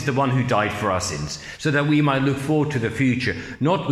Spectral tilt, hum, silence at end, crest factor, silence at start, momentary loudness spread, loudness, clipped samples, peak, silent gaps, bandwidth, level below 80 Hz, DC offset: -5.5 dB/octave; none; 0 s; 14 dB; 0 s; 8 LU; -22 LUFS; under 0.1%; -6 dBFS; none; 13.5 kHz; -50 dBFS; under 0.1%